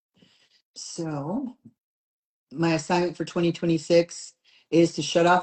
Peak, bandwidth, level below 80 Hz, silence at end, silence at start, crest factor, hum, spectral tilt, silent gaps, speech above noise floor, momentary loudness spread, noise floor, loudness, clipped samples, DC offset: -6 dBFS; 9 kHz; -64 dBFS; 0 s; 0.75 s; 18 dB; none; -5.5 dB/octave; 1.80-2.47 s; 37 dB; 18 LU; -61 dBFS; -25 LUFS; under 0.1%; under 0.1%